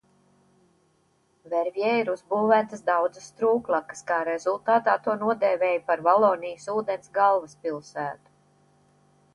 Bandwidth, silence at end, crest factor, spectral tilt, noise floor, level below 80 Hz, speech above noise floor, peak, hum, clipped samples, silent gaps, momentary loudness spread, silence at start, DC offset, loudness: 11.5 kHz; 1.2 s; 20 dB; -5 dB/octave; -67 dBFS; -74 dBFS; 42 dB; -6 dBFS; none; under 0.1%; none; 11 LU; 1.45 s; under 0.1%; -25 LUFS